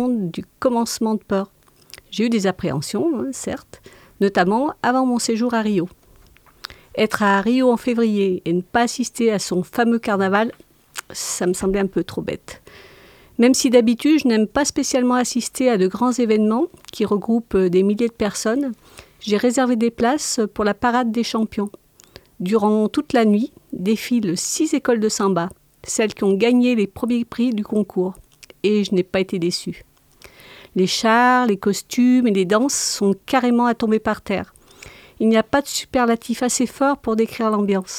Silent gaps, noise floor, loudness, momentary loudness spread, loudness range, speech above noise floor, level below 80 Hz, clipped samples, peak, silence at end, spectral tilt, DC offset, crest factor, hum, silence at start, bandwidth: none; -51 dBFS; -19 LUFS; 10 LU; 4 LU; 32 dB; -52 dBFS; under 0.1%; 0 dBFS; 0 s; -4.5 dB/octave; under 0.1%; 18 dB; none; 0 s; 16 kHz